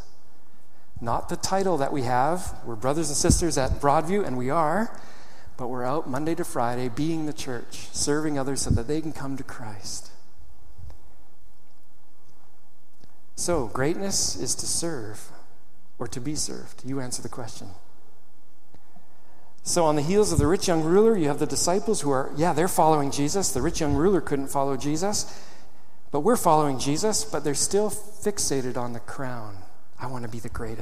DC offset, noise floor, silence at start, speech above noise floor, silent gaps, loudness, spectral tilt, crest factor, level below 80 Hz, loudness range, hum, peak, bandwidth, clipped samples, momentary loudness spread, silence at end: 4%; -63 dBFS; 0.95 s; 38 dB; none; -25 LUFS; -4.5 dB/octave; 22 dB; -44 dBFS; 12 LU; none; -4 dBFS; 15.5 kHz; under 0.1%; 15 LU; 0 s